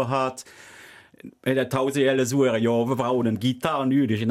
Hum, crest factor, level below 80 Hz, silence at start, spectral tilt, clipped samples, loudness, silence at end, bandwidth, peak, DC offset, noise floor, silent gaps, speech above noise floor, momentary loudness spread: none; 14 dB; -64 dBFS; 0 s; -6 dB/octave; under 0.1%; -23 LUFS; 0 s; 15.5 kHz; -8 dBFS; under 0.1%; -48 dBFS; none; 25 dB; 7 LU